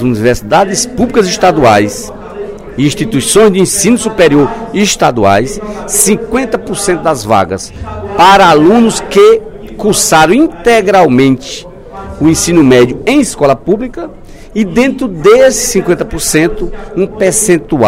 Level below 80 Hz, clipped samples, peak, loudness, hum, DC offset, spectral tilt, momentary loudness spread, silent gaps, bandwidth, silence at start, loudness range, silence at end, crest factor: -30 dBFS; 2%; 0 dBFS; -8 LUFS; none; under 0.1%; -4 dB/octave; 15 LU; none; 16.5 kHz; 0 s; 3 LU; 0 s; 8 dB